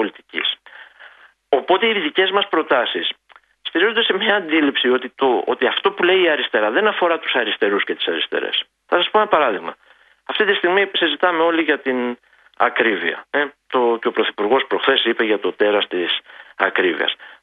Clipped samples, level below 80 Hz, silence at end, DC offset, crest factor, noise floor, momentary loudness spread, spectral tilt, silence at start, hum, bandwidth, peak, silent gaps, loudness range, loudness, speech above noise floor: under 0.1%; -70 dBFS; 0.1 s; under 0.1%; 18 dB; -46 dBFS; 7 LU; -6 dB/octave; 0 s; none; 4.7 kHz; 0 dBFS; none; 2 LU; -18 LUFS; 28 dB